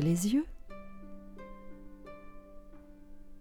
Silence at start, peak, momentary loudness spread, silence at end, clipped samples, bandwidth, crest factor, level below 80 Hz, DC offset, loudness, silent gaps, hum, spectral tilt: 0 s; -20 dBFS; 26 LU; 0 s; under 0.1%; 17.5 kHz; 18 dB; -52 dBFS; under 0.1%; -31 LUFS; none; none; -6 dB/octave